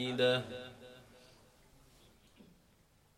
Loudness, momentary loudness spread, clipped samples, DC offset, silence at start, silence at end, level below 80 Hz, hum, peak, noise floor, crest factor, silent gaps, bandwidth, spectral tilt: -34 LUFS; 28 LU; under 0.1%; under 0.1%; 0 s; 0.75 s; -70 dBFS; none; -20 dBFS; -68 dBFS; 20 dB; none; 14.5 kHz; -5 dB/octave